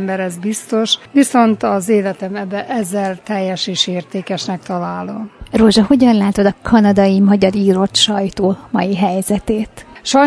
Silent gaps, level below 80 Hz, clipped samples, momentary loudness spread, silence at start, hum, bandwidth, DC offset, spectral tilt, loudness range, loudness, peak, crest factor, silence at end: none; -42 dBFS; under 0.1%; 11 LU; 0 s; none; 11 kHz; under 0.1%; -5 dB/octave; 6 LU; -15 LUFS; 0 dBFS; 14 dB; 0 s